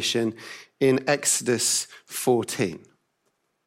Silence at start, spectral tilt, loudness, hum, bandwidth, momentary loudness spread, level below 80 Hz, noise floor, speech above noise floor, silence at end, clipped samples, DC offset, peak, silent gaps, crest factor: 0 s; -3 dB/octave; -24 LUFS; none; 16 kHz; 14 LU; -72 dBFS; -73 dBFS; 49 dB; 0.9 s; under 0.1%; under 0.1%; -8 dBFS; none; 18 dB